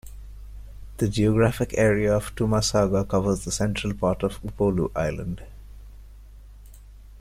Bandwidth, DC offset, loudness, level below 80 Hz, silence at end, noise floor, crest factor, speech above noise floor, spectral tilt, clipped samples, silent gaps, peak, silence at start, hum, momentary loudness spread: 15.5 kHz; under 0.1%; -24 LUFS; -40 dBFS; 0 s; -45 dBFS; 18 dB; 22 dB; -5.5 dB/octave; under 0.1%; none; -6 dBFS; 0.05 s; none; 23 LU